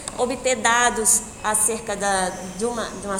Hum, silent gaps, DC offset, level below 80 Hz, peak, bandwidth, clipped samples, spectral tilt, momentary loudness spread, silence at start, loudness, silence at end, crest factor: none; none; under 0.1%; -46 dBFS; -4 dBFS; 18 kHz; under 0.1%; -1.5 dB/octave; 10 LU; 0 s; -20 LUFS; 0 s; 18 dB